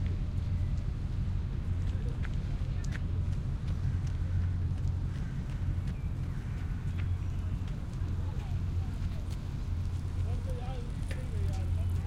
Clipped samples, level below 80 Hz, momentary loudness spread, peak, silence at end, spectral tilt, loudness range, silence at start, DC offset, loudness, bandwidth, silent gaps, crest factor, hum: under 0.1%; -36 dBFS; 4 LU; -20 dBFS; 0 s; -7.5 dB/octave; 2 LU; 0 s; under 0.1%; -35 LUFS; 10.5 kHz; none; 12 dB; none